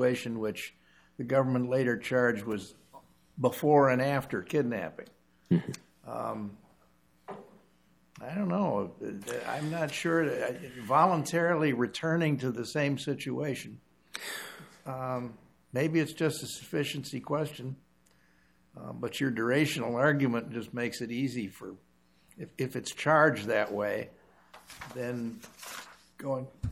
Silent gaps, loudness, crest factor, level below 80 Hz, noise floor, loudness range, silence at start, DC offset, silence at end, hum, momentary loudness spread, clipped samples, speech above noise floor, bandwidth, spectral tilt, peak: none; -31 LUFS; 22 dB; -64 dBFS; -67 dBFS; 7 LU; 0 s; under 0.1%; 0 s; none; 19 LU; under 0.1%; 36 dB; 16.5 kHz; -6 dB/octave; -8 dBFS